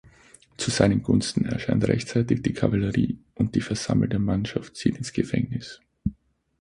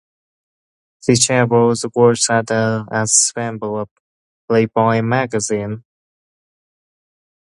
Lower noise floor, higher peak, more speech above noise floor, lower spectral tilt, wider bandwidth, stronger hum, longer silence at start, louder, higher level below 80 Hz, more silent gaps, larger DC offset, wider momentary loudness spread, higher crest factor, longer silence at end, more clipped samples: second, -56 dBFS vs under -90 dBFS; about the same, -2 dBFS vs 0 dBFS; second, 32 dB vs over 74 dB; first, -6 dB/octave vs -4 dB/octave; about the same, 11.5 kHz vs 11.5 kHz; neither; second, 0.6 s vs 1.05 s; second, -25 LUFS vs -16 LUFS; first, -46 dBFS vs -56 dBFS; second, none vs 3.91-4.48 s; neither; about the same, 10 LU vs 11 LU; about the same, 22 dB vs 18 dB; second, 0.5 s vs 1.75 s; neither